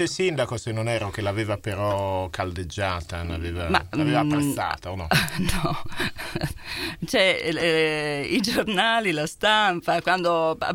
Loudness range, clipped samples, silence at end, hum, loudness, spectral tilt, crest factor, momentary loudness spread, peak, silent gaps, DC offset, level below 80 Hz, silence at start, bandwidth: 5 LU; under 0.1%; 0 s; none; -24 LUFS; -4.5 dB/octave; 20 dB; 10 LU; -4 dBFS; none; under 0.1%; -42 dBFS; 0 s; 16.5 kHz